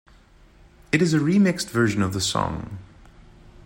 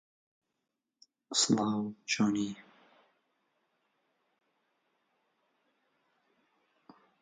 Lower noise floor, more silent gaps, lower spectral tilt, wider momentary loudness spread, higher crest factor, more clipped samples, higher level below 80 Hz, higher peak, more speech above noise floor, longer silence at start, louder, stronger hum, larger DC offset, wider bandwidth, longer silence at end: second, -52 dBFS vs -87 dBFS; neither; first, -5 dB/octave vs -3 dB/octave; first, 14 LU vs 10 LU; second, 18 dB vs 24 dB; neither; first, -50 dBFS vs -80 dBFS; first, -6 dBFS vs -14 dBFS; second, 31 dB vs 56 dB; second, 0.95 s vs 1.3 s; first, -22 LUFS vs -31 LUFS; neither; neither; first, 16.5 kHz vs 9.4 kHz; second, 0.8 s vs 4.6 s